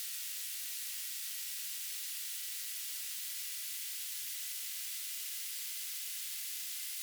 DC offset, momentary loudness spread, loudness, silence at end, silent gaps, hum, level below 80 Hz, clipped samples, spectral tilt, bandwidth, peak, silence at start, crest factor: under 0.1%; 0 LU; -38 LUFS; 0 s; none; none; under -90 dBFS; under 0.1%; 10 dB/octave; over 20 kHz; -26 dBFS; 0 s; 16 dB